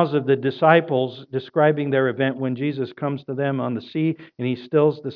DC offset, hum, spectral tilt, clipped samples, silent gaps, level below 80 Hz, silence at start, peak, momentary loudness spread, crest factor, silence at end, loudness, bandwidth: under 0.1%; none; -10 dB/octave; under 0.1%; none; -76 dBFS; 0 s; 0 dBFS; 10 LU; 20 dB; 0 s; -22 LUFS; 5.4 kHz